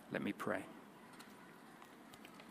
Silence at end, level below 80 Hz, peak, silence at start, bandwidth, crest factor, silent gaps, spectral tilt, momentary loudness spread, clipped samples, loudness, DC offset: 0 s; -84 dBFS; -24 dBFS; 0 s; 15.5 kHz; 24 dB; none; -5.5 dB/octave; 16 LU; under 0.1%; -47 LUFS; under 0.1%